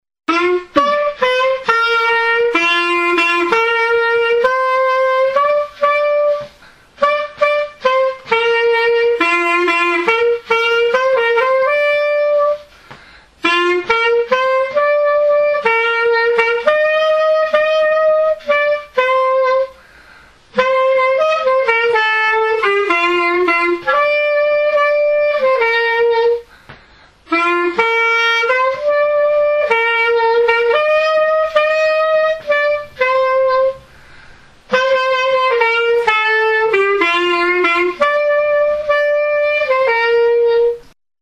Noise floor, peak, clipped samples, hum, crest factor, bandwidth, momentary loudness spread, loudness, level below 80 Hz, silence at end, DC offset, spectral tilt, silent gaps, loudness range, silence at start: -46 dBFS; 0 dBFS; under 0.1%; none; 14 dB; 11 kHz; 3 LU; -14 LUFS; -54 dBFS; 0.4 s; under 0.1%; -3 dB/octave; none; 2 LU; 0.3 s